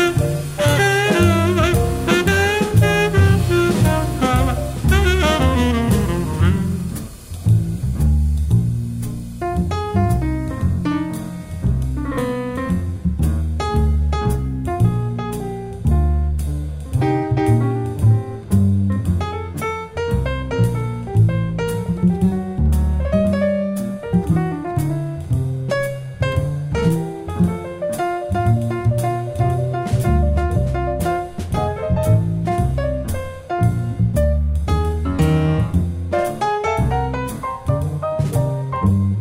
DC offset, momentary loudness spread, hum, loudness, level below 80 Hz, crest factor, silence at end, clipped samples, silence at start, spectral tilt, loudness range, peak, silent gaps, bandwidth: under 0.1%; 8 LU; none; -19 LUFS; -26 dBFS; 16 dB; 0 s; under 0.1%; 0 s; -6.5 dB/octave; 5 LU; -2 dBFS; none; 16 kHz